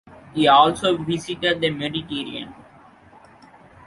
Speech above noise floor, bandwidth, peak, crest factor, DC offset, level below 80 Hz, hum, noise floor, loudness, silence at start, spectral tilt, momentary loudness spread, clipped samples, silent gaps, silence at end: 29 dB; 11.5 kHz; -2 dBFS; 22 dB; under 0.1%; -56 dBFS; none; -49 dBFS; -20 LUFS; 0.35 s; -5 dB/octave; 17 LU; under 0.1%; none; 1.35 s